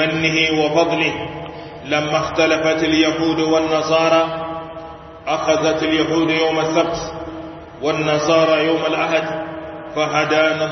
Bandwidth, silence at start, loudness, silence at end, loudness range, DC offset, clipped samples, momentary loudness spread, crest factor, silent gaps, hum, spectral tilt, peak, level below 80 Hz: 6.4 kHz; 0 s; -17 LUFS; 0 s; 2 LU; under 0.1%; under 0.1%; 15 LU; 16 dB; none; none; -4.5 dB/octave; -2 dBFS; -48 dBFS